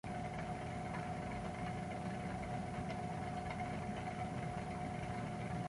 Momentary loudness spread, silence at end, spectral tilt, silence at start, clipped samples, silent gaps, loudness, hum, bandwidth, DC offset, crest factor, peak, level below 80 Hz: 1 LU; 0 s; -6.5 dB/octave; 0.05 s; under 0.1%; none; -43 LUFS; none; 11.5 kHz; under 0.1%; 12 dB; -30 dBFS; -56 dBFS